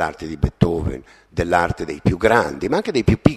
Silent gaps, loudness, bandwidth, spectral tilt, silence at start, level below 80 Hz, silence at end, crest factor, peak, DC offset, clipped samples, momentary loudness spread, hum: none; -20 LUFS; 13.5 kHz; -7 dB/octave; 0 s; -34 dBFS; 0 s; 18 dB; 0 dBFS; under 0.1%; under 0.1%; 10 LU; none